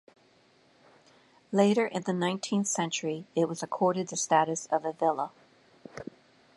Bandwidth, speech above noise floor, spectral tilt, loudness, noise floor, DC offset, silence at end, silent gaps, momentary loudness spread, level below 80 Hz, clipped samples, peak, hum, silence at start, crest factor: 11.5 kHz; 35 dB; -4.5 dB/octave; -29 LUFS; -63 dBFS; under 0.1%; 0.55 s; none; 16 LU; -76 dBFS; under 0.1%; -10 dBFS; none; 1.5 s; 20 dB